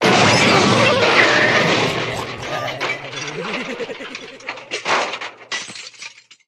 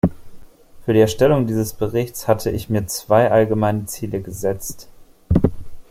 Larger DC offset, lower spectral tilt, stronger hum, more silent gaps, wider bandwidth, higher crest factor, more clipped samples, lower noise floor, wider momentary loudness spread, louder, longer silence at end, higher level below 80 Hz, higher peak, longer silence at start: neither; second, -3.5 dB/octave vs -6 dB/octave; neither; neither; second, 14.5 kHz vs 16.5 kHz; about the same, 18 dB vs 18 dB; neither; about the same, -39 dBFS vs -39 dBFS; first, 19 LU vs 12 LU; first, -16 LUFS vs -19 LUFS; first, 0.4 s vs 0.1 s; second, -54 dBFS vs -38 dBFS; about the same, 0 dBFS vs -2 dBFS; about the same, 0 s vs 0.05 s